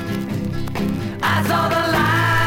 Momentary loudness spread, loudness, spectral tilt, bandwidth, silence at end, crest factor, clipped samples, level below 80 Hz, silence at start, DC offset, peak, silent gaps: 8 LU; -19 LUFS; -5.5 dB/octave; 17 kHz; 0 s; 14 dB; under 0.1%; -38 dBFS; 0 s; under 0.1%; -6 dBFS; none